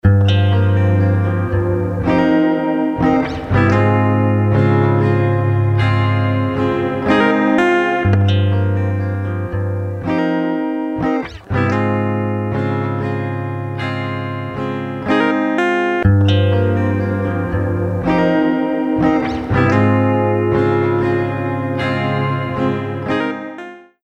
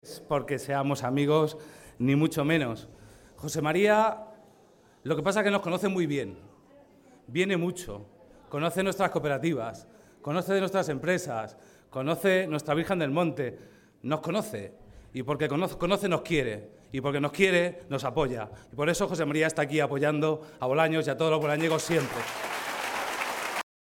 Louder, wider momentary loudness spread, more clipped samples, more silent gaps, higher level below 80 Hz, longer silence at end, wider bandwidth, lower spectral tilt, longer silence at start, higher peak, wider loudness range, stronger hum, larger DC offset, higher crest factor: first, -16 LUFS vs -28 LUFS; second, 8 LU vs 14 LU; neither; neither; first, -38 dBFS vs -58 dBFS; about the same, 0.25 s vs 0.35 s; second, 6.6 kHz vs 17 kHz; first, -8.5 dB/octave vs -5.5 dB/octave; about the same, 0.05 s vs 0.05 s; first, 0 dBFS vs -8 dBFS; about the same, 5 LU vs 4 LU; neither; neither; second, 14 dB vs 20 dB